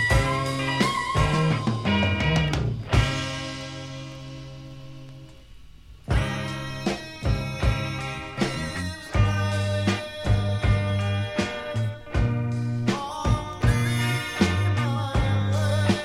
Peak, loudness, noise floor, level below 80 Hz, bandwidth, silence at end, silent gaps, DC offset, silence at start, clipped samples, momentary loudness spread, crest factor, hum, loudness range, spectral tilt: -6 dBFS; -25 LUFS; -46 dBFS; -34 dBFS; 13.5 kHz; 0 s; none; under 0.1%; 0 s; under 0.1%; 13 LU; 18 dB; none; 8 LU; -5.5 dB/octave